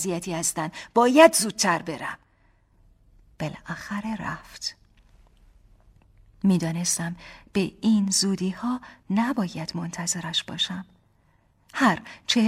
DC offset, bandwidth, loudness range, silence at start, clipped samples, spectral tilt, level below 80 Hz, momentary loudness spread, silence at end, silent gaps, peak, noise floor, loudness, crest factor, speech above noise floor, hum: under 0.1%; 16 kHz; 13 LU; 0 s; under 0.1%; -4 dB/octave; -58 dBFS; 14 LU; 0 s; none; -2 dBFS; -63 dBFS; -24 LUFS; 24 dB; 39 dB; none